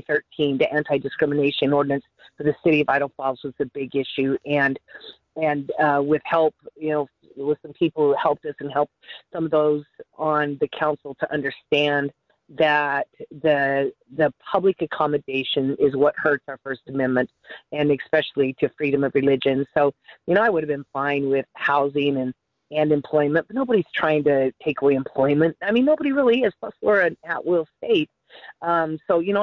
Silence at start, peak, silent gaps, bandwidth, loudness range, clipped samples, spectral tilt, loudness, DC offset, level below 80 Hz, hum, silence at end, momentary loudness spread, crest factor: 0.1 s; -6 dBFS; none; 6.2 kHz; 3 LU; under 0.1%; -8 dB/octave; -22 LUFS; under 0.1%; -62 dBFS; none; 0 s; 9 LU; 16 dB